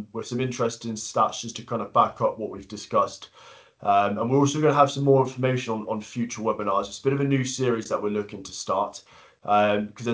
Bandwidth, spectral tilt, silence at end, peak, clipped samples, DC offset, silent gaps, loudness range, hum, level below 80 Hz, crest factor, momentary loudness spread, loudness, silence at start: 8 kHz; -5.5 dB/octave; 0 s; -4 dBFS; under 0.1%; under 0.1%; none; 4 LU; none; -62 dBFS; 20 dB; 12 LU; -25 LUFS; 0 s